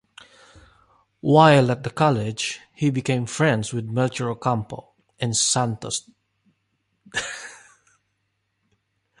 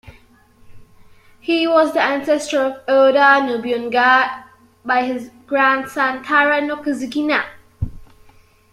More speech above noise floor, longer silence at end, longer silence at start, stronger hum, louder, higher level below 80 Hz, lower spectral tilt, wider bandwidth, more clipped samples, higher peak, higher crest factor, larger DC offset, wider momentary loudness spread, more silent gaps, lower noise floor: first, 53 dB vs 34 dB; first, 1.65 s vs 0.65 s; first, 1.25 s vs 0.05 s; neither; second, -22 LUFS vs -16 LUFS; second, -58 dBFS vs -46 dBFS; about the same, -4.5 dB/octave vs -4.5 dB/octave; second, 11.5 kHz vs 14 kHz; neither; about the same, -2 dBFS vs -2 dBFS; first, 22 dB vs 16 dB; neither; about the same, 15 LU vs 17 LU; neither; first, -74 dBFS vs -50 dBFS